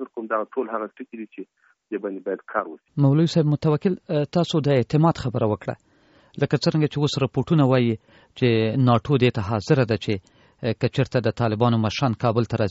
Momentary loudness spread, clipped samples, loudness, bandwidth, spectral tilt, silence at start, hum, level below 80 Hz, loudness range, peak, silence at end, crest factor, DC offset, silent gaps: 12 LU; under 0.1%; -22 LUFS; 8 kHz; -6.5 dB/octave; 0 s; none; -54 dBFS; 3 LU; -6 dBFS; 0 s; 18 dB; under 0.1%; none